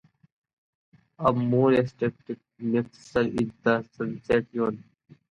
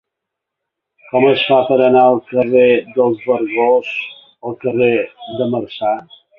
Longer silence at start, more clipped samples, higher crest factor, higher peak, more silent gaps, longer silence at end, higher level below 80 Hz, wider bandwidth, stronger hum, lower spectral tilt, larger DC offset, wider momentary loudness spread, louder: about the same, 1.2 s vs 1.15 s; neither; first, 20 dB vs 14 dB; second, -8 dBFS vs 0 dBFS; neither; first, 0.5 s vs 0.35 s; about the same, -56 dBFS vs -58 dBFS; first, 10 kHz vs 4.8 kHz; neither; about the same, -8 dB/octave vs -8 dB/octave; neither; about the same, 12 LU vs 12 LU; second, -26 LUFS vs -15 LUFS